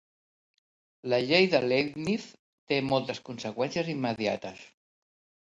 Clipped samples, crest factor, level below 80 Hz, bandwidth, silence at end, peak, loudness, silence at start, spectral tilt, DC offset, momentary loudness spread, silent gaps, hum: under 0.1%; 22 dB; -68 dBFS; 10.5 kHz; 0.85 s; -10 dBFS; -28 LUFS; 1.05 s; -5.5 dB/octave; under 0.1%; 14 LU; 2.39-2.67 s; none